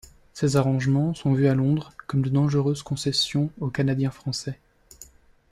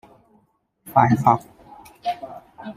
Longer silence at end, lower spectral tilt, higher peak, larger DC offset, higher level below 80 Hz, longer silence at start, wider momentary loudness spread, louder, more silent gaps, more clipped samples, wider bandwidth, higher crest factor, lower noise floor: first, 0.45 s vs 0.05 s; second, -6 dB/octave vs -7.5 dB/octave; second, -10 dBFS vs 0 dBFS; neither; about the same, -54 dBFS vs -58 dBFS; second, 0.35 s vs 0.85 s; second, 9 LU vs 20 LU; second, -24 LUFS vs -20 LUFS; neither; neither; second, 12.5 kHz vs 15.5 kHz; second, 16 dB vs 22 dB; second, -51 dBFS vs -64 dBFS